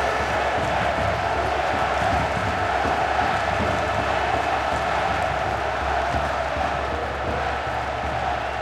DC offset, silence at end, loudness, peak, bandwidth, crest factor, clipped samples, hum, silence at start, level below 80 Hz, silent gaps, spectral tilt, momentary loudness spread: under 0.1%; 0 s; -23 LUFS; -8 dBFS; 15 kHz; 14 dB; under 0.1%; none; 0 s; -36 dBFS; none; -5 dB/octave; 4 LU